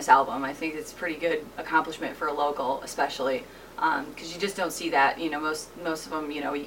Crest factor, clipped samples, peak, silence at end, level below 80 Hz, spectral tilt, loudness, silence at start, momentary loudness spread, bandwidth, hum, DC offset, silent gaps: 24 dB; under 0.1%; -4 dBFS; 0 s; -60 dBFS; -3 dB/octave; -28 LUFS; 0 s; 10 LU; 17 kHz; 60 Hz at -60 dBFS; under 0.1%; none